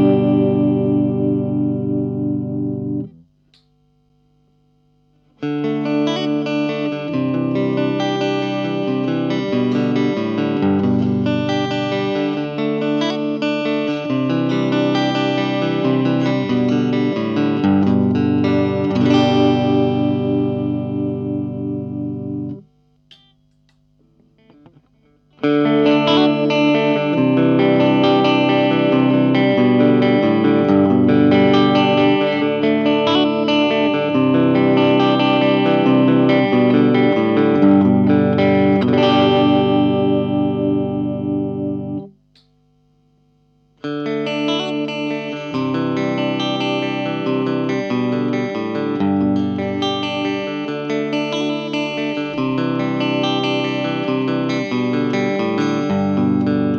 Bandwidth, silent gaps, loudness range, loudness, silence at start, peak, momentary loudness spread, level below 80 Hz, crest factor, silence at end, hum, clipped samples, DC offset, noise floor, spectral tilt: 6.8 kHz; none; 11 LU; -17 LUFS; 0 s; -2 dBFS; 8 LU; -62 dBFS; 14 dB; 0 s; 50 Hz at -55 dBFS; under 0.1%; under 0.1%; -59 dBFS; -7.5 dB/octave